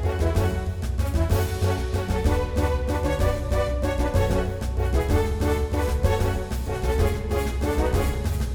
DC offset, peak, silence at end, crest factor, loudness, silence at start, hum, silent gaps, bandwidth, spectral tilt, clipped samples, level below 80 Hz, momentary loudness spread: under 0.1%; -8 dBFS; 0 s; 16 dB; -25 LUFS; 0 s; none; none; 19 kHz; -6.5 dB/octave; under 0.1%; -26 dBFS; 4 LU